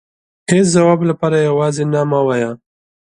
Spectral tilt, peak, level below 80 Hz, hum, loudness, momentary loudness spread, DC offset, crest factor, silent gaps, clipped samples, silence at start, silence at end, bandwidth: -6 dB/octave; 0 dBFS; -54 dBFS; none; -14 LUFS; 10 LU; under 0.1%; 14 dB; none; under 0.1%; 0.5 s; 0.6 s; 11 kHz